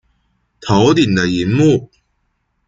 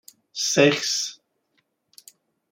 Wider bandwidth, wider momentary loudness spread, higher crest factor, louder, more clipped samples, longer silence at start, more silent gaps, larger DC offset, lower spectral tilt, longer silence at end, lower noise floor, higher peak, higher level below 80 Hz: second, 7.8 kHz vs 16.5 kHz; second, 7 LU vs 13 LU; second, 16 dB vs 22 dB; first, -14 LUFS vs -21 LUFS; neither; first, 0.6 s vs 0.35 s; neither; neither; first, -6 dB/octave vs -3 dB/octave; second, 0.8 s vs 1.35 s; second, -66 dBFS vs -71 dBFS; first, 0 dBFS vs -4 dBFS; first, -46 dBFS vs -72 dBFS